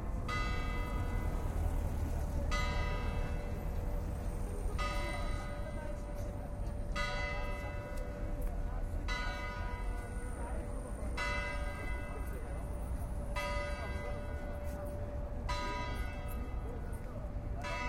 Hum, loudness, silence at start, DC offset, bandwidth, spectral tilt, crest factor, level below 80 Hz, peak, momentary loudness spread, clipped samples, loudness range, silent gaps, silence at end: none; -40 LUFS; 0 s; under 0.1%; 16 kHz; -5.5 dB/octave; 16 dB; -40 dBFS; -22 dBFS; 6 LU; under 0.1%; 3 LU; none; 0 s